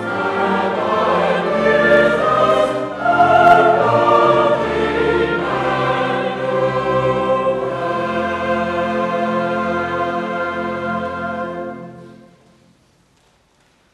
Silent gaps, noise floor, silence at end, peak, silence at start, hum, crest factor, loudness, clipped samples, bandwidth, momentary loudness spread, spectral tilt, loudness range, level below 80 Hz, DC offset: none; -57 dBFS; 1.8 s; 0 dBFS; 0 s; none; 16 dB; -16 LUFS; under 0.1%; 11.5 kHz; 10 LU; -6.5 dB/octave; 11 LU; -46 dBFS; under 0.1%